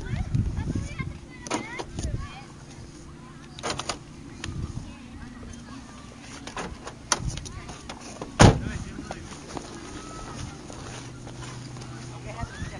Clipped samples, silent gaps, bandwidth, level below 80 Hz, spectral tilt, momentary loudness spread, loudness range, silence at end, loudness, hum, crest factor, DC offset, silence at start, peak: under 0.1%; none; 11.5 kHz; -40 dBFS; -5 dB/octave; 15 LU; 12 LU; 0 s; -30 LUFS; none; 30 dB; under 0.1%; 0 s; 0 dBFS